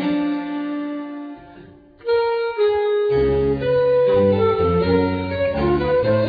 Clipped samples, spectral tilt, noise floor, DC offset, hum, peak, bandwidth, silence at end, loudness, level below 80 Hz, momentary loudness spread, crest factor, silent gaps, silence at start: under 0.1%; -10 dB/octave; -44 dBFS; under 0.1%; none; -6 dBFS; 5 kHz; 0 s; -19 LUFS; -40 dBFS; 13 LU; 12 dB; none; 0 s